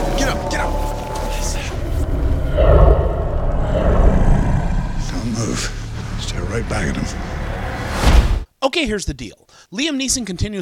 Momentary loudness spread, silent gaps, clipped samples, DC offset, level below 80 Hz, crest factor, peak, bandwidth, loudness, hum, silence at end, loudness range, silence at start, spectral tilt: 10 LU; none; under 0.1%; under 0.1%; -20 dBFS; 16 dB; 0 dBFS; 15.5 kHz; -20 LUFS; none; 0 s; 5 LU; 0 s; -5 dB/octave